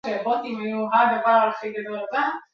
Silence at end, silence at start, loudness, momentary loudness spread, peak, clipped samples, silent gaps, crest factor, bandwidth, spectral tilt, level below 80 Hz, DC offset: 0.15 s; 0.05 s; -22 LUFS; 11 LU; -4 dBFS; under 0.1%; none; 18 dB; 6.8 kHz; -6 dB/octave; -74 dBFS; under 0.1%